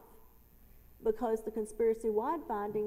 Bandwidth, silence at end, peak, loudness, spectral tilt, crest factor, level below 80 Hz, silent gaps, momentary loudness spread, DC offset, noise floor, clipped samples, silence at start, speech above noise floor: 15.5 kHz; 0 s; -20 dBFS; -34 LUFS; -6.5 dB/octave; 16 dB; -58 dBFS; none; 5 LU; under 0.1%; -59 dBFS; under 0.1%; 0 s; 26 dB